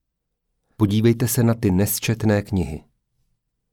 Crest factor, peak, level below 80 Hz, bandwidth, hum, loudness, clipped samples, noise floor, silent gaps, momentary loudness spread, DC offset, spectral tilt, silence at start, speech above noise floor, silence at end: 16 dB; -6 dBFS; -46 dBFS; over 20 kHz; none; -20 LUFS; under 0.1%; -77 dBFS; none; 7 LU; under 0.1%; -6 dB/octave; 0.8 s; 58 dB; 0.95 s